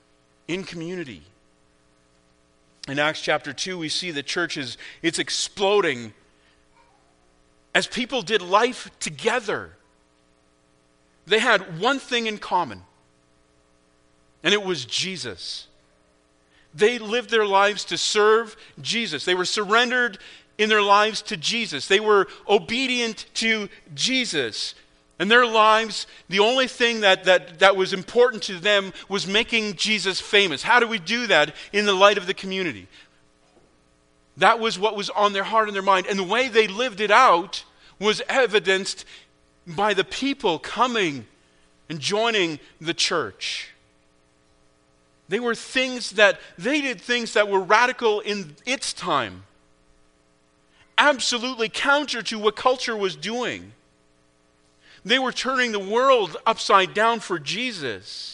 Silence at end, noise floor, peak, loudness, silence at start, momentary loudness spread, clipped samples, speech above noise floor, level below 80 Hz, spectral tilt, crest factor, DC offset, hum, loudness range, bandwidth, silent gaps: 0 s; -61 dBFS; 0 dBFS; -21 LUFS; 0.5 s; 13 LU; under 0.1%; 39 dB; -62 dBFS; -2.5 dB/octave; 24 dB; under 0.1%; none; 7 LU; 10.5 kHz; none